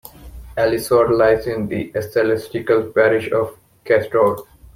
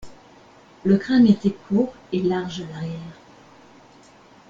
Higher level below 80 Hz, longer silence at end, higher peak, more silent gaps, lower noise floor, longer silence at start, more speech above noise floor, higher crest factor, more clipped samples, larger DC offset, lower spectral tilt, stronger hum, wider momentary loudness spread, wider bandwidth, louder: first, -44 dBFS vs -56 dBFS; second, 0.3 s vs 1.4 s; about the same, -2 dBFS vs -4 dBFS; neither; second, -37 dBFS vs -50 dBFS; first, 0.2 s vs 0 s; second, 20 dB vs 29 dB; about the same, 16 dB vs 18 dB; neither; neither; second, -6 dB/octave vs -7.5 dB/octave; neither; second, 8 LU vs 16 LU; first, 16 kHz vs 7.4 kHz; first, -18 LUFS vs -21 LUFS